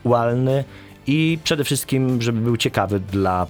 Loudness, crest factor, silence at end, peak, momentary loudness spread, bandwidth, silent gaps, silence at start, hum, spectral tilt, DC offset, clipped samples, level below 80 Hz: -20 LUFS; 16 dB; 0 s; -4 dBFS; 4 LU; over 20 kHz; none; 0.05 s; none; -5.5 dB/octave; under 0.1%; under 0.1%; -50 dBFS